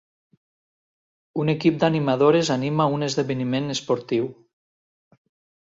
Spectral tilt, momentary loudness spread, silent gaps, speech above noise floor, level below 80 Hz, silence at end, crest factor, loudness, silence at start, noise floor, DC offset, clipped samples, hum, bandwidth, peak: -6 dB/octave; 8 LU; none; over 69 dB; -64 dBFS; 1.3 s; 18 dB; -22 LUFS; 1.35 s; under -90 dBFS; under 0.1%; under 0.1%; none; 7.8 kHz; -6 dBFS